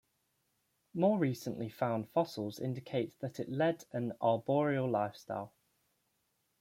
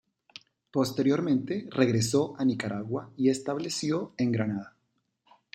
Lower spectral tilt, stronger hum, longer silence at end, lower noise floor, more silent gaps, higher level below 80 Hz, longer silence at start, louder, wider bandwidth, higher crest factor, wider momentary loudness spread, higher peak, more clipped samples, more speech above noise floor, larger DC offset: first, -7 dB/octave vs -5.5 dB/octave; neither; first, 1.15 s vs 0.85 s; about the same, -79 dBFS vs -76 dBFS; neither; second, -78 dBFS vs -68 dBFS; first, 0.95 s vs 0.75 s; second, -35 LUFS vs -28 LUFS; about the same, 16.5 kHz vs 15 kHz; about the same, 20 dB vs 20 dB; first, 11 LU vs 8 LU; second, -16 dBFS vs -8 dBFS; neither; second, 45 dB vs 49 dB; neither